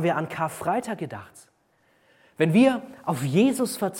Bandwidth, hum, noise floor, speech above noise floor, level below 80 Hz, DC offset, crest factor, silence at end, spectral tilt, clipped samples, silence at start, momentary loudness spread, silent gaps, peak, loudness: 17.5 kHz; none; -65 dBFS; 41 dB; -70 dBFS; under 0.1%; 18 dB; 0 s; -6 dB/octave; under 0.1%; 0 s; 14 LU; none; -8 dBFS; -24 LUFS